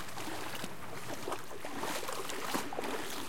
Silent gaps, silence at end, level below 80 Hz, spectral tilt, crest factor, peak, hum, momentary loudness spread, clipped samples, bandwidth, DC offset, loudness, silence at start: none; 0 s; -66 dBFS; -3 dB/octave; 22 dB; -20 dBFS; none; 6 LU; under 0.1%; 17 kHz; 1%; -40 LUFS; 0 s